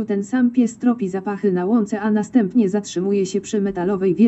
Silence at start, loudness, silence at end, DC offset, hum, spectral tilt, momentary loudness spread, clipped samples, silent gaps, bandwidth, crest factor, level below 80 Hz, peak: 0 s; -20 LUFS; 0 s; under 0.1%; none; -7 dB/octave; 4 LU; under 0.1%; none; 8.2 kHz; 14 dB; -58 dBFS; -4 dBFS